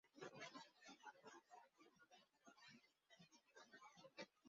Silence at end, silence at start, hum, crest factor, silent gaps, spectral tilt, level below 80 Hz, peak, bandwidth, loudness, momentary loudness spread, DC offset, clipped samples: 0 s; 0.05 s; none; 22 dB; none; -2 dB/octave; under -90 dBFS; -42 dBFS; 7.4 kHz; -63 LUFS; 11 LU; under 0.1%; under 0.1%